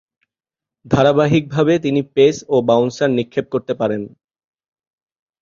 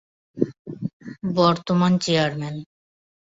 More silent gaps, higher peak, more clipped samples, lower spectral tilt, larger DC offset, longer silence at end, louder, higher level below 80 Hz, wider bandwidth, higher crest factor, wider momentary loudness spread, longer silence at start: second, none vs 0.59-0.65 s, 0.93-1.00 s; about the same, -2 dBFS vs -4 dBFS; neither; about the same, -6.5 dB/octave vs -6 dB/octave; neither; first, 1.35 s vs 0.6 s; first, -17 LUFS vs -22 LUFS; first, -50 dBFS vs -60 dBFS; about the same, 7.4 kHz vs 7.8 kHz; about the same, 16 dB vs 20 dB; second, 8 LU vs 14 LU; first, 0.85 s vs 0.35 s